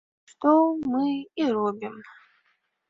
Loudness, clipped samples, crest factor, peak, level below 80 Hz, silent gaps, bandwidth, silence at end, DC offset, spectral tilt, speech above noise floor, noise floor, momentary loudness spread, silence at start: -24 LUFS; under 0.1%; 20 dB; -6 dBFS; -68 dBFS; none; 7.8 kHz; 0.8 s; under 0.1%; -7 dB/octave; 47 dB; -71 dBFS; 17 LU; 0.4 s